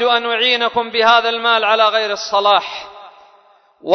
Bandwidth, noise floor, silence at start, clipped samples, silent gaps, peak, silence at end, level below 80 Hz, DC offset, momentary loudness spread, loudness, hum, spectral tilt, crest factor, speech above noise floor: 6.4 kHz; -51 dBFS; 0 s; under 0.1%; none; 0 dBFS; 0 s; -64 dBFS; under 0.1%; 16 LU; -14 LUFS; none; -1.5 dB/octave; 16 dB; 36 dB